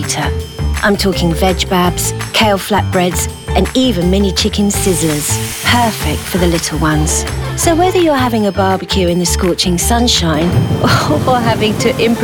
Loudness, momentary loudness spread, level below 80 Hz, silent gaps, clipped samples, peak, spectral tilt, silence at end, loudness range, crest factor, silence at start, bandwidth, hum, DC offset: -13 LUFS; 4 LU; -24 dBFS; none; under 0.1%; 0 dBFS; -4.5 dB/octave; 0 s; 1 LU; 12 dB; 0 s; over 20 kHz; none; under 0.1%